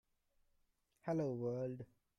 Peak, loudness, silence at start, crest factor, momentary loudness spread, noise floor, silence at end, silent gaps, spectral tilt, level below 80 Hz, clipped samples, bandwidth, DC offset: -28 dBFS; -42 LUFS; 1.05 s; 16 dB; 11 LU; -80 dBFS; 0.35 s; none; -9 dB/octave; -76 dBFS; under 0.1%; 11 kHz; under 0.1%